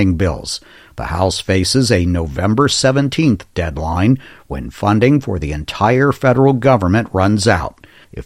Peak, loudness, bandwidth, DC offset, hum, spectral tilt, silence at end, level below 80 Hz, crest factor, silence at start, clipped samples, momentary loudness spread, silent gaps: 0 dBFS; -15 LUFS; 15.5 kHz; under 0.1%; none; -5.5 dB/octave; 0 s; -36 dBFS; 14 dB; 0 s; under 0.1%; 13 LU; none